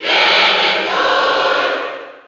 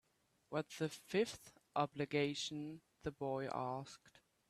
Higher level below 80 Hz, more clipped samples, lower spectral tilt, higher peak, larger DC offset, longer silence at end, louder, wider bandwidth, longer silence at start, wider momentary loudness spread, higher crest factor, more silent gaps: first, -60 dBFS vs -74 dBFS; neither; second, -1.5 dB/octave vs -5 dB/octave; first, -2 dBFS vs -22 dBFS; neither; second, 0.05 s vs 0.4 s; first, -13 LUFS vs -42 LUFS; second, 8 kHz vs 14 kHz; second, 0 s vs 0.5 s; about the same, 9 LU vs 11 LU; second, 12 dB vs 20 dB; neither